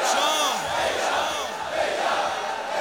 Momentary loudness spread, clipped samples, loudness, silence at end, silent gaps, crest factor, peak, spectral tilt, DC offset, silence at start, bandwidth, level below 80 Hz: 7 LU; under 0.1%; -24 LUFS; 0 s; none; 16 dB; -8 dBFS; -0.5 dB/octave; under 0.1%; 0 s; over 20 kHz; -60 dBFS